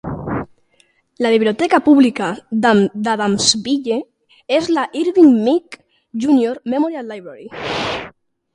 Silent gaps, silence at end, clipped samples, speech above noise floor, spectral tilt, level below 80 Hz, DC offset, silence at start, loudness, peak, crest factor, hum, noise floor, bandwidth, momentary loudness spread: none; 0.45 s; under 0.1%; 43 dB; -4 dB/octave; -50 dBFS; under 0.1%; 0.05 s; -16 LUFS; 0 dBFS; 16 dB; none; -58 dBFS; 11 kHz; 16 LU